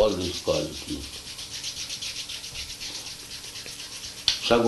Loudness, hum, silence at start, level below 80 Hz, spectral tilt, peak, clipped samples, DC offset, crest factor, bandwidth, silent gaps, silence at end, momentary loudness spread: -30 LUFS; none; 0 s; -48 dBFS; -3 dB/octave; -2 dBFS; under 0.1%; under 0.1%; 28 dB; 12 kHz; none; 0 s; 11 LU